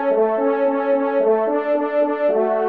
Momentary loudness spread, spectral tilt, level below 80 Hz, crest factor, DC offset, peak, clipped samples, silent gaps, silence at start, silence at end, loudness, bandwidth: 2 LU; -8.5 dB/octave; -72 dBFS; 12 dB; 0.2%; -6 dBFS; under 0.1%; none; 0 s; 0 s; -19 LUFS; 4.7 kHz